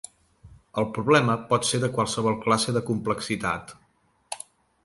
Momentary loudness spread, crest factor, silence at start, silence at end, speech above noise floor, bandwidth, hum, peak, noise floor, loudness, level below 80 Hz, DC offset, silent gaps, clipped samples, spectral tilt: 17 LU; 22 dB; 0.45 s; 0.45 s; 41 dB; 11.5 kHz; none; -4 dBFS; -65 dBFS; -25 LUFS; -56 dBFS; under 0.1%; none; under 0.1%; -4.5 dB/octave